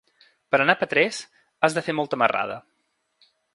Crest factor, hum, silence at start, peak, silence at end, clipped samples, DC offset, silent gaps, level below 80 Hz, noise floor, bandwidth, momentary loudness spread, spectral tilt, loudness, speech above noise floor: 24 dB; none; 0.5 s; 0 dBFS; 0.95 s; under 0.1%; under 0.1%; none; -70 dBFS; -68 dBFS; 11.5 kHz; 11 LU; -4 dB/octave; -22 LUFS; 46 dB